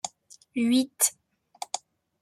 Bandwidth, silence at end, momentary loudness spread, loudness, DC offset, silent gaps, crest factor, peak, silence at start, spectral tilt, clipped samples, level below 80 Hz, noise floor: 15.5 kHz; 0.45 s; 14 LU; -27 LUFS; under 0.1%; none; 24 dB; -6 dBFS; 0.05 s; -1.5 dB/octave; under 0.1%; -76 dBFS; -44 dBFS